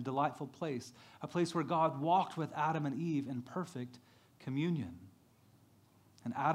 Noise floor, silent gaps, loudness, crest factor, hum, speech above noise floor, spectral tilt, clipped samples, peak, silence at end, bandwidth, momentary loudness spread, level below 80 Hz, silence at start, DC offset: -66 dBFS; none; -37 LUFS; 18 dB; none; 30 dB; -7 dB/octave; under 0.1%; -18 dBFS; 0 s; 15 kHz; 15 LU; -82 dBFS; 0 s; under 0.1%